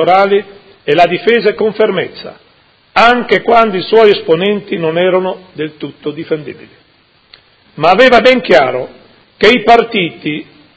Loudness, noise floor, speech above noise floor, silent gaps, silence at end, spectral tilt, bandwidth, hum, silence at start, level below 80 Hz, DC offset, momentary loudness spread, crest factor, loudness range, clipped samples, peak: -10 LUFS; -50 dBFS; 40 dB; none; 0.35 s; -5.5 dB/octave; 8 kHz; none; 0 s; -46 dBFS; under 0.1%; 15 LU; 12 dB; 6 LU; 1%; 0 dBFS